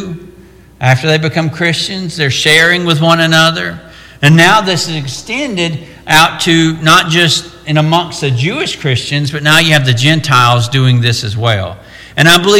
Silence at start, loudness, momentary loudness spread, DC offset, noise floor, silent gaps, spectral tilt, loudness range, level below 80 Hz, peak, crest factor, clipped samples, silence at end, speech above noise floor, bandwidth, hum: 0 s; -10 LUFS; 11 LU; under 0.1%; -38 dBFS; none; -4 dB/octave; 2 LU; -42 dBFS; 0 dBFS; 10 dB; 0.2%; 0 s; 28 dB; 17 kHz; none